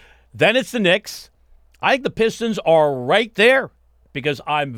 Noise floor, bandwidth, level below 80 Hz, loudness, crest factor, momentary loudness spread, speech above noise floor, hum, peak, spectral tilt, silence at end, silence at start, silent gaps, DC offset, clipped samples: -52 dBFS; 16.5 kHz; -54 dBFS; -18 LUFS; 16 dB; 12 LU; 34 dB; none; -4 dBFS; -4.5 dB/octave; 0 s; 0.35 s; none; under 0.1%; under 0.1%